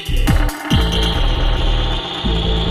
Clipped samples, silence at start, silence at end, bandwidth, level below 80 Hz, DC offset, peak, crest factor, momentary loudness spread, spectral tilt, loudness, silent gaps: under 0.1%; 0 s; 0 s; 15.5 kHz; -18 dBFS; under 0.1%; -2 dBFS; 14 dB; 3 LU; -5 dB/octave; -18 LUFS; none